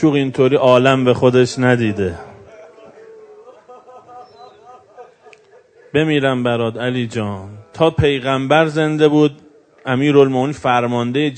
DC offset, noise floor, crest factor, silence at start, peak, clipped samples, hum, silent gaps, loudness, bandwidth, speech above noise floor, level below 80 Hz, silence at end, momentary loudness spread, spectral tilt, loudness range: under 0.1%; -48 dBFS; 16 dB; 0 s; 0 dBFS; under 0.1%; none; none; -15 LUFS; 9.4 kHz; 33 dB; -48 dBFS; 0 s; 10 LU; -6.5 dB/octave; 8 LU